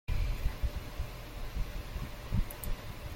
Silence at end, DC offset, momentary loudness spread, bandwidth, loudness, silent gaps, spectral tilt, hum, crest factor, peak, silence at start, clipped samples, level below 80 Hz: 0 s; under 0.1%; 6 LU; 16.5 kHz; -40 LUFS; none; -5.5 dB/octave; none; 16 dB; -18 dBFS; 0.1 s; under 0.1%; -36 dBFS